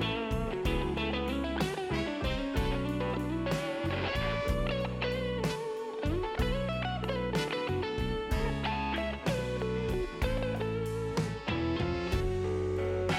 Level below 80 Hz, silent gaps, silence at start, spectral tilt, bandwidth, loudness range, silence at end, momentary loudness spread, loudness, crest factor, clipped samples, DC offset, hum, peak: -40 dBFS; none; 0 s; -6 dB/octave; 16.5 kHz; 1 LU; 0 s; 2 LU; -33 LUFS; 14 dB; under 0.1%; under 0.1%; none; -18 dBFS